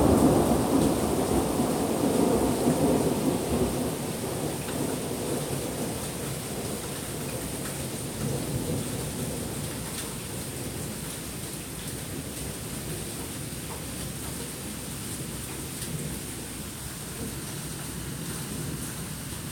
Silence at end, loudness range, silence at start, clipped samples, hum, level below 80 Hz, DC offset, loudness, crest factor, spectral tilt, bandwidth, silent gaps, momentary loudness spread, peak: 0 s; 9 LU; 0 s; under 0.1%; none; -44 dBFS; under 0.1%; -30 LUFS; 20 dB; -5 dB/octave; 17 kHz; none; 10 LU; -10 dBFS